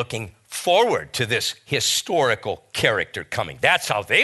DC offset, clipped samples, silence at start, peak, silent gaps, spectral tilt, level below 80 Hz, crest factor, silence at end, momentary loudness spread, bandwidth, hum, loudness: under 0.1%; under 0.1%; 0 s; -2 dBFS; none; -2.5 dB/octave; -56 dBFS; 20 dB; 0 s; 10 LU; 12.5 kHz; none; -21 LUFS